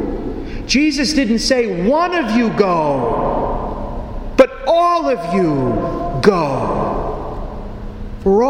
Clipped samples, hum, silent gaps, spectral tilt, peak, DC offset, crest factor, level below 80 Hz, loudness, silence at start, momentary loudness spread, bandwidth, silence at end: under 0.1%; none; none; -5.5 dB/octave; 0 dBFS; under 0.1%; 16 dB; -30 dBFS; -16 LUFS; 0 s; 14 LU; 15.5 kHz; 0 s